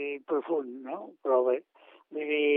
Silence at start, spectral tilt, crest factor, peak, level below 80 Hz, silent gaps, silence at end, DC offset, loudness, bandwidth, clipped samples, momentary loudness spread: 0 s; -1 dB/octave; 16 dB; -14 dBFS; under -90 dBFS; none; 0 s; under 0.1%; -31 LUFS; 3.7 kHz; under 0.1%; 13 LU